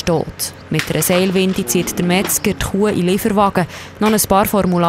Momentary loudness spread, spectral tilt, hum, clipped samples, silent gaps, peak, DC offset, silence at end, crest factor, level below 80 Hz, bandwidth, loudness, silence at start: 7 LU; -4.5 dB/octave; none; under 0.1%; none; 0 dBFS; under 0.1%; 0 s; 16 dB; -38 dBFS; 16 kHz; -16 LUFS; 0 s